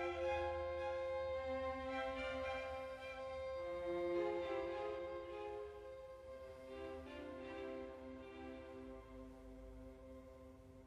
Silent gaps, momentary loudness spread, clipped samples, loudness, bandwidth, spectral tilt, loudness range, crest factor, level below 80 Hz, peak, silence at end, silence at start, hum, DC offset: none; 16 LU; under 0.1%; -46 LUFS; 10.5 kHz; -6 dB/octave; 9 LU; 16 dB; -62 dBFS; -30 dBFS; 0 s; 0 s; none; under 0.1%